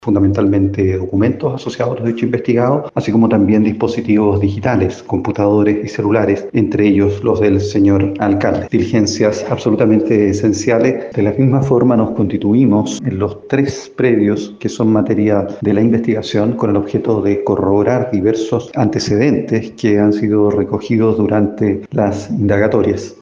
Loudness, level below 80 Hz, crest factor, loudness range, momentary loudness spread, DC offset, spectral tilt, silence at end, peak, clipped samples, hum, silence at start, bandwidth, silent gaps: -14 LUFS; -46 dBFS; 12 dB; 2 LU; 5 LU; under 0.1%; -7.5 dB/octave; 0.05 s; 0 dBFS; under 0.1%; none; 0.05 s; 7.6 kHz; none